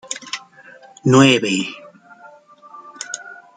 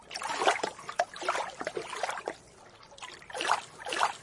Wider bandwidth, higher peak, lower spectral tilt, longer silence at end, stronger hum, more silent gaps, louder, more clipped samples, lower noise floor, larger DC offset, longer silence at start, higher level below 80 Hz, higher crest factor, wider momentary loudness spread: second, 9.4 kHz vs 11.5 kHz; first, -2 dBFS vs -10 dBFS; first, -4.5 dB/octave vs -1 dB/octave; first, 0.25 s vs 0 s; neither; neither; first, -17 LUFS vs -33 LUFS; neither; second, -45 dBFS vs -54 dBFS; neither; about the same, 0.1 s vs 0 s; first, -62 dBFS vs -70 dBFS; about the same, 20 dB vs 24 dB; first, 21 LU vs 17 LU